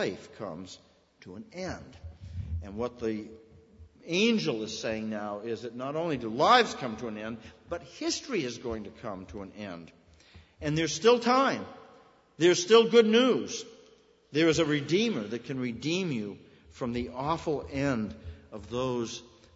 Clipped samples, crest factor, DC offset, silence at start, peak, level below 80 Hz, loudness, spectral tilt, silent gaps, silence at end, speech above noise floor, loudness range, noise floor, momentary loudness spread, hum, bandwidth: under 0.1%; 22 dB; under 0.1%; 0 s; -8 dBFS; -54 dBFS; -28 LUFS; -4.5 dB/octave; none; 0.3 s; 31 dB; 12 LU; -60 dBFS; 21 LU; none; 8 kHz